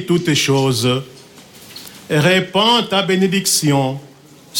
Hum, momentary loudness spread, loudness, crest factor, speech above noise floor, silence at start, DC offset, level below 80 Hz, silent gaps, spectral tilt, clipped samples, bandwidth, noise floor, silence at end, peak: none; 19 LU; -15 LUFS; 14 dB; 26 dB; 0 s; under 0.1%; -56 dBFS; none; -4 dB/octave; under 0.1%; 17.5 kHz; -41 dBFS; 0 s; -2 dBFS